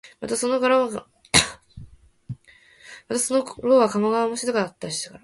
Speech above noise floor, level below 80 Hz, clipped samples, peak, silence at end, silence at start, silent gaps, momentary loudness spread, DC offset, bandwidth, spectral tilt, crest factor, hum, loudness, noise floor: 31 dB; -52 dBFS; under 0.1%; 0 dBFS; 0.05 s; 0.05 s; none; 18 LU; under 0.1%; 12 kHz; -3 dB/octave; 24 dB; none; -22 LUFS; -53 dBFS